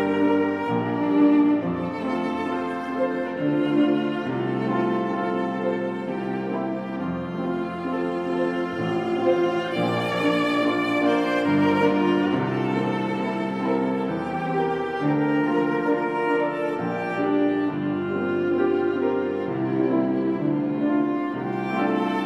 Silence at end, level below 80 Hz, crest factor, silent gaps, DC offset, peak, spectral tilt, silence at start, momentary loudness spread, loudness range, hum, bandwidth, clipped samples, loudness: 0 s; -66 dBFS; 14 dB; none; under 0.1%; -8 dBFS; -7.5 dB/octave; 0 s; 6 LU; 4 LU; none; 9.4 kHz; under 0.1%; -24 LUFS